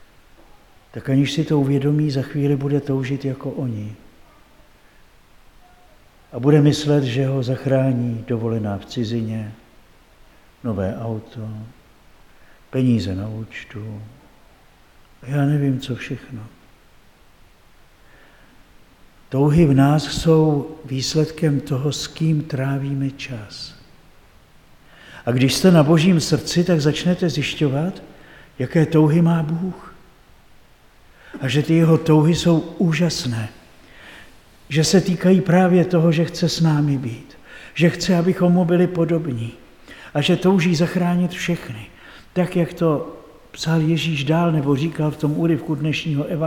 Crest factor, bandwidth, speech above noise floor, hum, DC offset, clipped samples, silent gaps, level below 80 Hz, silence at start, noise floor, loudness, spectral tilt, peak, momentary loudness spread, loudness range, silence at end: 18 dB; 15.5 kHz; 32 dB; none; under 0.1%; under 0.1%; none; -48 dBFS; 0.95 s; -50 dBFS; -19 LUFS; -6.5 dB/octave; -2 dBFS; 17 LU; 9 LU; 0 s